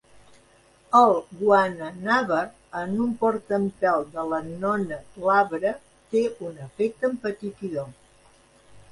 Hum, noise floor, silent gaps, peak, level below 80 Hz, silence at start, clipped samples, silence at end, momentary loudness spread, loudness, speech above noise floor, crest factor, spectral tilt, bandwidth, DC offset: none; -57 dBFS; none; -4 dBFS; -62 dBFS; 0.9 s; under 0.1%; 0.1 s; 13 LU; -24 LUFS; 33 dB; 20 dB; -6.5 dB/octave; 11.5 kHz; under 0.1%